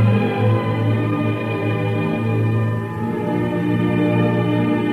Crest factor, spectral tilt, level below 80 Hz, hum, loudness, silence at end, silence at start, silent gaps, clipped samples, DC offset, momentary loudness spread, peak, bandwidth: 12 dB; -9 dB/octave; -52 dBFS; none; -19 LUFS; 0 s; 0 s; none; under 0.1%; under 0.1%; 4 LU; -6 dBFS; 4.7 kHz